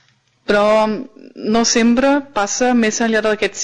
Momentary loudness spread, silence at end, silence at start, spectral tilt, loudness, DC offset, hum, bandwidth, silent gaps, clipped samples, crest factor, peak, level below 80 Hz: 13 LU; 0 s; 0.5 s; -3 dB/octave; -15 LUFS; under 0.1%; none; 10 kHz; none; under 0.1%; 10 dB; -6 dBFS; -46 dBFS